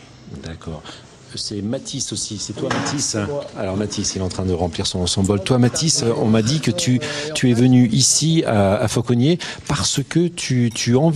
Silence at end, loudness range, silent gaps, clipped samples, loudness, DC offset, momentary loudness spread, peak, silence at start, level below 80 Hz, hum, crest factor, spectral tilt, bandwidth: 0 s; 8 LU; none; under 0.1%; -18 LUFS; under 0.1%; 13 LU; -2 dBFS; 0 s; -46 dBFS; none; 16 dB; -4.5 dB/octave; 13.5 kHz